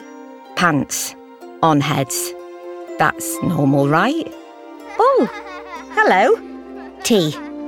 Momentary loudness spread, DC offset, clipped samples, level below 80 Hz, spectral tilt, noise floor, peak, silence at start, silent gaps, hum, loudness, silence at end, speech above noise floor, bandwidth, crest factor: 20 LU; under 0.1%; under 0.1%; -56 dBFS; -4.5 dB/octave; -37 dBFS; -2 dBFS; 0 s; none; none; -17 LUFS; 0 s; 21 dB; 19 kHz; 18 dB